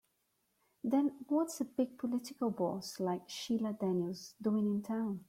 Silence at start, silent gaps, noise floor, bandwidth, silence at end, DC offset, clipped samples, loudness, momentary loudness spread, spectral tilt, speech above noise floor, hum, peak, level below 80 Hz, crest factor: 0.85 s; none; -80 dBFS; 16 kHz; 0.05 s; under 0.1%; under 0.1%; -36 LUFS; 5 LU; -6 dB/octave; 44 dB; none; -22 dBFS; -78 dBFS; 14 dB